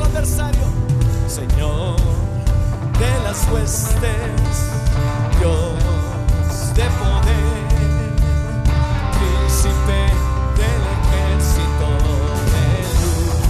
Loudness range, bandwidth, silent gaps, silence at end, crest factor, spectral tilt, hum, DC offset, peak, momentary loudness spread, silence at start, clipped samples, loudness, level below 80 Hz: 1 LU; 14 kHz; none; 0 s; 10 dB; -5.5 dB/octave; none; under 0.1%; -6 dBFS; 3 LU; 0 s; under 0.1%; -18 LUFS; -18 dBFS